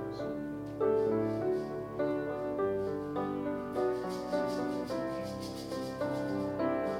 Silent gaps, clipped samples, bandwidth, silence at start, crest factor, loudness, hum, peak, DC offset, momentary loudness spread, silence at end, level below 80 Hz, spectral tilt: none; under 0.1%; 16 kHz; 0 s; 14 dB; -34 LUFS; none; -18 dBFS; under 0.1%; 7 LU; 0 s; -60 dBFS; -7 dB/octave